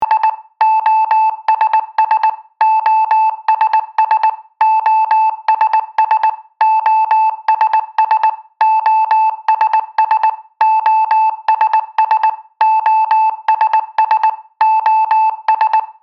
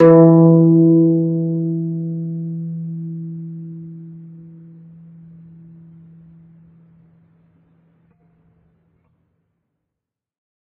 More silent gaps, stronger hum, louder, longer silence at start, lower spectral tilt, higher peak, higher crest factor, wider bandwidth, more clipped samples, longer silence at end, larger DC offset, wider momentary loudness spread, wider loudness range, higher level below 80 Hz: neither; neither; about the same, -13 LUFS vs -15 LUFS; about the same, 0 s vs 0 s; second, -0.5 dB/octave vs -12 dB/octave; about the same, 0 dBFS vs 0 dBFS; second, 12 dB vs 18 dB; first, 5.8 kHz vs 2.7 kHz; neither; second, 0.1 s vs 6.35 s; neither; second, 4 LU vs 26 LU; second, 1 LU vs 27 LU; second, -76 dBFS vs -62 dBFS